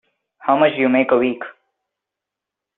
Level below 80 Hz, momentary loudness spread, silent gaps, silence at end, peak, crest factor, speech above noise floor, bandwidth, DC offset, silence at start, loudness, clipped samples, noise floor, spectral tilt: -66 dBFS; 14 LU; none; 1.25 s; -2 dBFS; 18 dB; 68 dB; 4 kHz; under 0.1%; 0.45 s; -17 LUFS; under 0.1%; -84 dBFS; -3.5 dB/octave